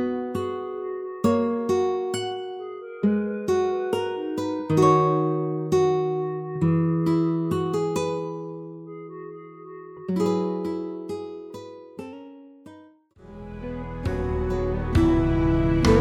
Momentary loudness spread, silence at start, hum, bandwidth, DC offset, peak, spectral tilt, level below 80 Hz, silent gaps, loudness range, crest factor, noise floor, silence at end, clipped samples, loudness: 19 LU; 0 s; none; 14.5 kHz; under 0.1%; -6 dBFS; -7.5 dB/octave; -38 dBFS; none; 10 LU; 18 dB; -51 dBFS; 0 s; under 0.1%; -25 LUFS